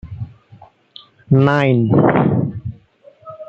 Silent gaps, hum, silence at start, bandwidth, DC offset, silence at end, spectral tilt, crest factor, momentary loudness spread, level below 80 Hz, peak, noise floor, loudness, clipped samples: none; none; 0.05 s; 6.2 kHz; under 0.1%; 0.05 s; -9.5 dB/octave; 16 dB; 19 LU; -48 dBFS; -2 dBFS; -48 dBFS; -15 LUFS; under 0.1%